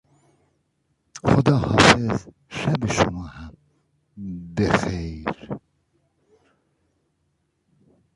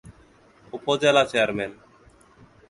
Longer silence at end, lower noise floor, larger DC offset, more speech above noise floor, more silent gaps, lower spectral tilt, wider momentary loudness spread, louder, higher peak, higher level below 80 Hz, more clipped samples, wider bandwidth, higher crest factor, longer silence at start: first, 2.6 s vs 0.95 s; first, -71 dBFS vs -55 dBFS; neither; first, 48 dB vs 33 dB; neither; about the same, -5 dB/octave vs -4 dB/octave; first, 23 LU vs 15 LU; about the same, -21 LUFS vs -22 LUFS; first, 0 dBFS vs -6 dBFS; first, -44 dBFS vs -58 dBFS; neither; about the same, 11.5 kHz vs 11.5 kHz; about the same, 24 dB vs 20 dB; first, 1.15 s vs 0.05 s